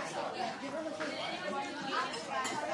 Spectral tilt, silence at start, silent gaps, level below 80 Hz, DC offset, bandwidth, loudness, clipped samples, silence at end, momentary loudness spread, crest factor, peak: -3 dB/octave; 0 s; none; -78 dBFS; under 0.1%; 11.5 kHz; -37 LUFS; under 0.1%; 0 s; 3 LU; 16 dB; -22 dBFS